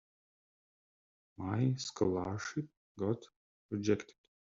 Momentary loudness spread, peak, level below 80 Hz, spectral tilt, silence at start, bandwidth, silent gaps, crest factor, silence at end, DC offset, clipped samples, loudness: 10 LU; -16 dBFS; -70 dBFS; -6.5 dB/octave; 1.4 s; 7.6 kHz; 2.77-2.95 s, 3.36-3.69 s; 22 dB; 0.4 s; under 0.1%; under 0.1%; -37 LUFS